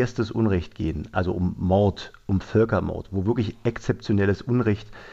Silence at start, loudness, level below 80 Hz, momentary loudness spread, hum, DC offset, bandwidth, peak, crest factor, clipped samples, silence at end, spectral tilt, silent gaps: 0 s; -24 LUFS; -46 dBFS; 7 LU; none; under 0.1%; 7.6 kHz; -8 dBFS; 16 dB; under 0.1%; 0 s; -8 dB/octave; none